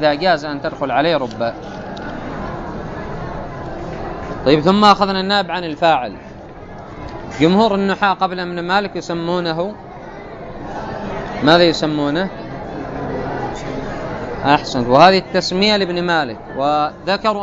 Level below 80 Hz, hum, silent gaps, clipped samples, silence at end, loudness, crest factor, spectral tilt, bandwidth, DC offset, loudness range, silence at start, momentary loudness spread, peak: -40 dBFS; none; none; under 0.1%; 0 s; -17 LUFS; 18 dB; -5.5 dB/octave; 8 kHz; under 0.1%; 7 LU; 0 s; 18 LU; 0 dBFS